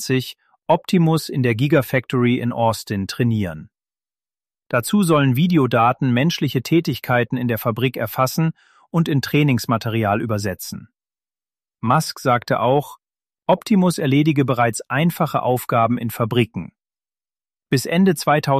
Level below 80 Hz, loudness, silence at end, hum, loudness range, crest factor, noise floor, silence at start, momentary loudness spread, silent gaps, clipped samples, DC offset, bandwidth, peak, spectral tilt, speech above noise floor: -56 dBFS; -19 LUFS; 0 s; none; 4 LU; 16 dB; under -90 dBFS; 0 s; 8 LU; none; under 0.1%; under 0.1%; 15 kHz; -4 dBFS; -6 dB/octave; over 72 dB